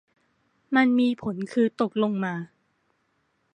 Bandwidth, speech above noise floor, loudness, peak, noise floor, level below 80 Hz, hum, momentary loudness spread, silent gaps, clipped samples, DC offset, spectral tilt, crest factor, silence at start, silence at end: 9.4 kHz; 48 dB; -24 LUFS; -6 dBFS; -71 dBFS; -68 dBFS; none; 10 LU; none; under 0.1%; under 0.1%; -7 dB/octave; 20 dB; 0.7 s; 1.1 s